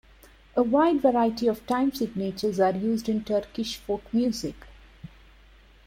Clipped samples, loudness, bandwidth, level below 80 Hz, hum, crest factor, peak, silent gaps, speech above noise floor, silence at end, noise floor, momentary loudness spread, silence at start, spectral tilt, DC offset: under 0.1%; -26 LUFS; 16.5 kHz; -54 dBFS; none; 18 dB; -10 dBFS; none; 29 dB; 0.8 s; -54 dBFS; 10 LU; 0.55 s; -6 dB/octave; under 0.1%